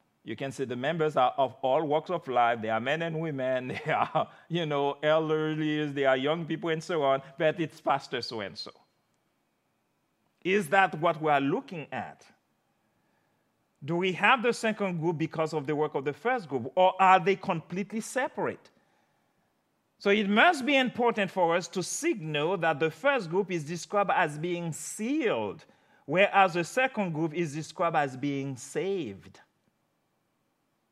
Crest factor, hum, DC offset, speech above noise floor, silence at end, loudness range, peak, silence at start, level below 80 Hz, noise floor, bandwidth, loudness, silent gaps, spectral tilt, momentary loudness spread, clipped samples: 22 dB; none; under 0.1%; 47 dB; 1.65 s; 5 LU; -6 dBFS; 0.25 s; -82 dBFS; -75 dBFS; 14.5 kHz; -28 LUFS; none; -5 dB/octave; 11 LU; under 0.1%